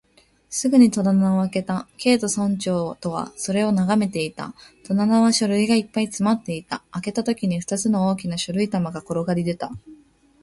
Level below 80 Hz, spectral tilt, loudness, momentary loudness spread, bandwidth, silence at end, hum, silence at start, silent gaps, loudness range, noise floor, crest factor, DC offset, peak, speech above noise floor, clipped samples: -58 dBFS; -5.5 dB/octave; -22 LUFS; 12 LU; 11.5 kHz; 0.5 s; none; 0.5 s; none; 3 LU; -58 dBFS; 18 dB; under 0.1%; -4 dBFS; 36 dB; under 0.1%